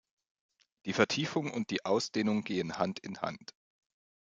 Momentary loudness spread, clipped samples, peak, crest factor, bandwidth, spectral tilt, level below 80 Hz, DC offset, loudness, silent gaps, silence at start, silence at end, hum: 11 LU; under 0.1%; -10 dBFS; 26 dB; 7.8 kHz; -4.5 dB/octave; -76 dBFS; under 0.1%; -33 LUFS; none; 0.85 s; 1 s; none